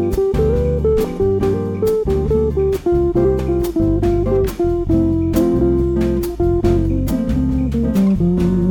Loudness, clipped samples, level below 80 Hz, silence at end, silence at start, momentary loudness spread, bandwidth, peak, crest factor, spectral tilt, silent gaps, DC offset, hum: -17 LUFS; under 0.1%; -24 dBFS; 0 s; 0 s; 3 LU; 18 kHz; -4 dBFS; 12 dB; -9 dB/octave; none; under 0.1%; none